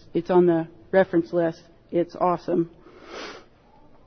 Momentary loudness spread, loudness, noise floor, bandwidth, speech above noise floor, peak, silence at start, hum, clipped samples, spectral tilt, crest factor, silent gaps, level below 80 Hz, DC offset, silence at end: 18 LU; -23 LUFS; -53 dBFS; 6.4 kHz; 31 dB; -8 dBFS; 0.15 s; none; under 0.1%; -8 dB/octave; 16 dB; none; -60 dBFS; under 0.1%; 0.65 s